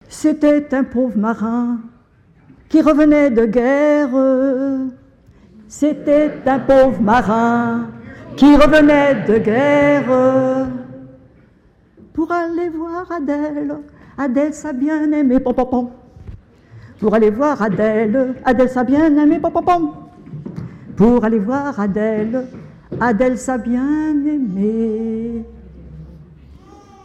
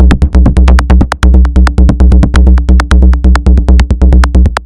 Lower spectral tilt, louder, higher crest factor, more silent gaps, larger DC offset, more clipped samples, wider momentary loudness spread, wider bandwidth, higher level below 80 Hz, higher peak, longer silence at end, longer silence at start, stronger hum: about the same, -7 dB/octave vs -7.5 dB/octave; second, -15 LUFS vs -7 LUFS; first, 16 dB vs 4 dB; neither; neither; second, under 0.1% vs 2%; first, 15 LU vs 2 LU; about the same, 9.6 kHz vs 9.2 kHz; second, -38 dBFS vs -4 dBFS; about the same, 0 dBFS vs 0 dBFS; first, 0.5 s vs 0 s; about the same, 0.1 s vs 0 s; neither